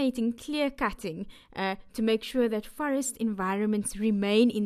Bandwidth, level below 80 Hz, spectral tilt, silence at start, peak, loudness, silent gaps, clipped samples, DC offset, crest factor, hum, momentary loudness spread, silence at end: 15 kHz; -54 dBFS; -4.5 dB/octave; 0 s; -10 dBFS; -29 LUFS; none; under 0.1%; under 0.1%; 18 dB; none; 8 LU; 0 s